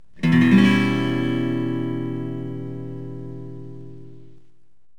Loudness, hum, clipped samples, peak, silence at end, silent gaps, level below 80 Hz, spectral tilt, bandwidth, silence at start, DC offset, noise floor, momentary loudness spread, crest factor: -20 LUFS; none; under 0.1%; -4 dBFS; 0.8 s; none; -56 dBFS; -7.5 dB/octave; 11 kHz; 0.2 s; 1%; -57 dBFS; 22 LU; 18 dB